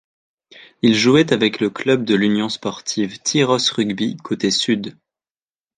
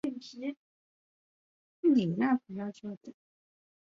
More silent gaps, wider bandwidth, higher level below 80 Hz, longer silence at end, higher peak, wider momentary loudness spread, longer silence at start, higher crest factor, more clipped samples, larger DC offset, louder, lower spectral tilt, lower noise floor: second, none vs 0.57-1.83 s, 2.97-3.01 s; first, 9.8 kHz vs 7.4 kHz; first, -60 dBFS vs -78 dBFS; about the same, 0.85 s vs 0.75 s; first, -2 dBFS vs -16 dBFS; second, 9 LU vs 17 LU; first, 0.55 s vs 0.05 s; about the same, 18 dB vs 18 dB; neither; neither; first, -18 LUFS vs -31 LUFS; second, -4 dB/octave vs -7.5 dB/octave; about the same, under -90 dBFS vs under -90 dBFS